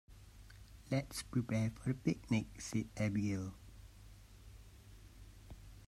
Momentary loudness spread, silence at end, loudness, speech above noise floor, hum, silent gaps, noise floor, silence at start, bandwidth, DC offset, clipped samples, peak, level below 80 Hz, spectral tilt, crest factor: 22 LU; 0 s; -39 LUFS; 20 dB; none; none; -58 dBFS; 0.1 s; 15.5 kHz; under 0.1%; under 0.1%; -22 dBFS; -58 dBFS; -6 dB/octave; 20 dB